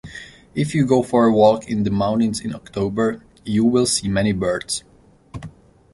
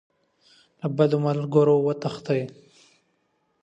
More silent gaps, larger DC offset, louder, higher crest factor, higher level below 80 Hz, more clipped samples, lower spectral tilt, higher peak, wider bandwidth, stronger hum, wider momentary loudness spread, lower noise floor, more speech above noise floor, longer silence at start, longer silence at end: neither; neither; first, -19 LUFS vs -23 LUFS; about the same, 18 dB vs 18 dB; first, -46 dBFS vs -70 dBFS; neither; second, -5.5 dB/octave vs -8.5 dB/octave; first, -2 dBFS vs -6 dBFS; first, 11.5 kHz vs 8.2 kHz; neither; first, 21 LU vs 11 LU; second, -41 dBFS vs -71 dBFS; second, 22 dB vs 49 dB; second, 0.05 s vs 0.85 s; second, 0.45 s vs 1.15 s